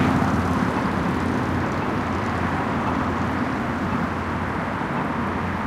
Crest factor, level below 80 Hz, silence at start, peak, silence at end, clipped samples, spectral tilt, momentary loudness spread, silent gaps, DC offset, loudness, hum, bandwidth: 16 dB; -40 dBFS; 0 s; -8 dBFS; 0 s; under 0.1%; -7 dB/octave; 4 LU; none; under 0.1%; -24 LUFS; none; 15 kHz